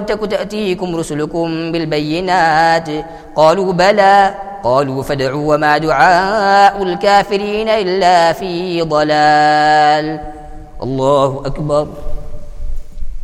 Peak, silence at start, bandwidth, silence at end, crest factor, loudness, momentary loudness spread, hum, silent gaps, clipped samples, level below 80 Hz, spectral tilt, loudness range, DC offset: 0 dBFS; 0 s; 14 kHz; 0 s; 14 dB; -13 LUFS; 15 LU; none; none; under 0.1%; -30 dBFS; -5 dB/octave; 4 LU; under 0.1%